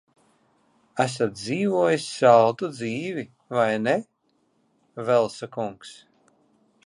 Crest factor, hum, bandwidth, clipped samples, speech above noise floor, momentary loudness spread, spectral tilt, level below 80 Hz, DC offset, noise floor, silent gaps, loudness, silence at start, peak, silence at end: 22 dB; none; 11.5 kHz; under 0.1%; 46 dB; 16 LU; -5.5 dB/octave; -70 dBFS; under 0.1%; -68 dBFS; none; -23 LUFS; 0.95 s; -4 dBFS; 0.95 s